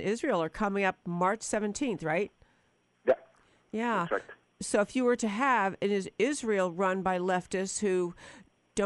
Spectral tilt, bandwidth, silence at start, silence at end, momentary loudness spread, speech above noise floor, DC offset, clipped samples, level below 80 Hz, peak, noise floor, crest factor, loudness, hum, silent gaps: -4.5 dB/octave; 11.5 kHz; 0 s; 0 s; 7 LU; 40 dB; under 0.1%; under 0.1%; -62 dBFS; -12 dBFS; -70 dBFS; 18 dB; -30 LUFS; none; none